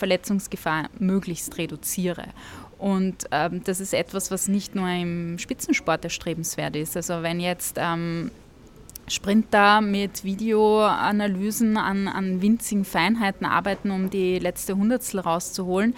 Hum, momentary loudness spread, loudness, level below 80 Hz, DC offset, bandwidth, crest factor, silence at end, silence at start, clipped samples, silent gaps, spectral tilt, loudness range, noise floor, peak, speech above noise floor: none; 9 LU; -24 LUFS; -52 dBFS; under 0.1%; 17 kHz; 20 dB; 0 s; 0 s; under 0.1%; none; -4.5 dB/octave; 6 LU; -47 dBFS; -4 dBFS; 23 dB